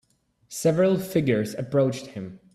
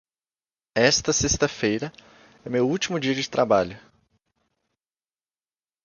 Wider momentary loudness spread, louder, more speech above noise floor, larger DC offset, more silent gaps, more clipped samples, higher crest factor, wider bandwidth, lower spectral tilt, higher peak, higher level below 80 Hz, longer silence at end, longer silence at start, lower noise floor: first, 16 LU vs 11 LU; about the same, -24 LUFS vs -23 LUFS; second, 37 dB vs over 67 dB; neither; neither; neither; second, 16 dB vs 22 dB; first, 16 kHz vs 10.5 kHz; first, -6.5 dB/octave vs -3.5 dB/octave; second, -8 dBFS vs -4 dBFS; second, -60 dBFS vs -48 dBFS; second, 0.15 s vs 2.05 s; second, 0.5 s vs 0.75 s; second, -60 dBFS vs under -90 dBFS